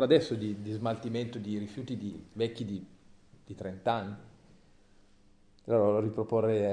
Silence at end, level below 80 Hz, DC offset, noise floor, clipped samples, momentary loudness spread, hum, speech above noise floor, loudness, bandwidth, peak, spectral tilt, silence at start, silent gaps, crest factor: 0 s; -66 dBFS; under 0.1%; -61 dBFS; under 0.1%; 16 LU; none; 30 dB; -32 LUFS; 10 kHz; -10 dBFS; -7.5 dB/octave; 0 s; none; 22 dB